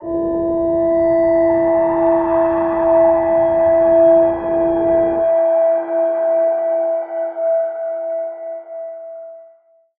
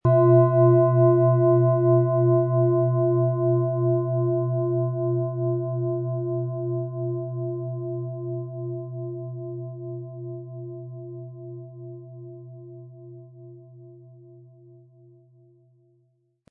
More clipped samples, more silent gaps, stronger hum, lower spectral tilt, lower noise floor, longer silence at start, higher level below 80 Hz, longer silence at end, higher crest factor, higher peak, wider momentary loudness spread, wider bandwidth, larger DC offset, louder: neither; neither; neither; second, -11 dB/octave vs -15 dB/octave; second, -52 dBFS vs -67 dBFS; about the same, 0 s vs 0.05 s; first, -46 dBFS vs -64 dBFS; second, 0.55 s vs 2.5 s; second, 12 dB vs 18 dB; about the same, -4 dBFS vs -6 dBFS; second, 13 LU vs 23 LU; first, 3.5 kHz vs 2.1 kHz; neither; first, -15 LUFS vs -23 LUFS